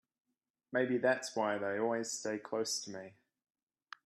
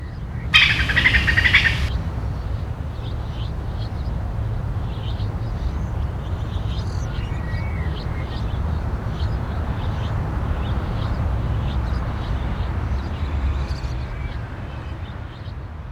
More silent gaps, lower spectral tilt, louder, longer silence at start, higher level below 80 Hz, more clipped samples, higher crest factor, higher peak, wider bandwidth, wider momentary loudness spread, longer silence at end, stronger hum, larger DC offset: neither; second, -3 dB/octave vs -5.5 dB/octave; second, -35 LUFS vs -23 LUFS; first, 0.7 s vs 0 s; second, -86 dBFS vs -26 dBFS; neither; about the same, 20 dB vs 22 dB; second, -18 dBFS vs 0 dBFS; first, 14 kHz vs 12 kHz; about the same, 15 LU vs 15 LU; first, 0.95 s vs 0 s; neither; neither